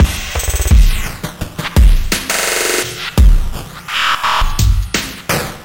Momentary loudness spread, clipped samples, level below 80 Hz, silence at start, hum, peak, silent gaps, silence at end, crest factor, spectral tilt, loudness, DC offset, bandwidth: 10 LU; under 0.1%; -14 dBFS; 0 s; none; 0 dBFS; none; 0 s; 12 dB; -3.5 dB/octave; -15 LUFS; under 0.1%; 17 kHz